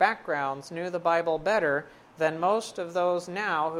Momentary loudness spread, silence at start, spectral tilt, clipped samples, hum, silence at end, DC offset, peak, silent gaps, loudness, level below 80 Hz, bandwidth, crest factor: 7 LU; 0 s; -4.5 dB/octave; under 0.1%; none; 0 s; under 0.1%; -8 dBFS; none; -28 LUFS; -64 dBFS; 14 kHz; 18 dB